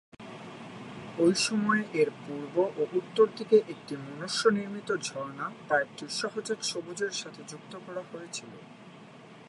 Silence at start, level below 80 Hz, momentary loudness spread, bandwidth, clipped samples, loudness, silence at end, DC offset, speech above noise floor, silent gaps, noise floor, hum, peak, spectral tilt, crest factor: 0.2 s; -76 dBFS; 19 LU; 11.5 kHz; under 0.1%; -30 LUFS; 0 s; under 0.1%; 20 dB; none; -50 dBFS; none; -10 dBFS; -4 dB/octave; 20 dB